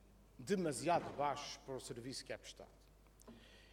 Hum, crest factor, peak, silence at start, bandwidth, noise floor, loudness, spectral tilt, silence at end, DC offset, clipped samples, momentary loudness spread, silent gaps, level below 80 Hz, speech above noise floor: none; 20 dB; -24 dBFS; 0.05 s; 17.5 kHz; -64 dBFS; -42 LUFS; -4.5 dB/octave; 0 s; under 0.1%; under 0.1%; 23 LU; none; -68 dBFS; 22 dB